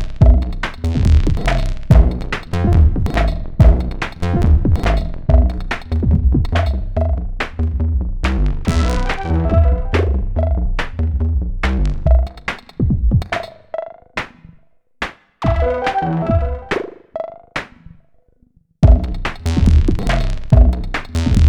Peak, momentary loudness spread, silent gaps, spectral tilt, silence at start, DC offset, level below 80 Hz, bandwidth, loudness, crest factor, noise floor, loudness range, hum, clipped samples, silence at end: 0 dBFS; 13 LU; none; -7.5 dB/octave; 0 s; under 0.1%; -18 dBFS; 9.4 kHz; -18 LUFS; 14 dB; -54 dBFS; 6 LU; none; under 0.1%; 0 s